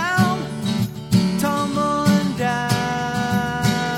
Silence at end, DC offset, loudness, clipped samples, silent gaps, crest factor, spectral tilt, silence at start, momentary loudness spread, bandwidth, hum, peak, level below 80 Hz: 0 s; under 0.1%; -20 LUFS; under 0.1%; none; 14 dB; -5.5 dB/octave; 0 s; 5 LU; 16.5 kHz; none; -6 dBFS; -46 dBFS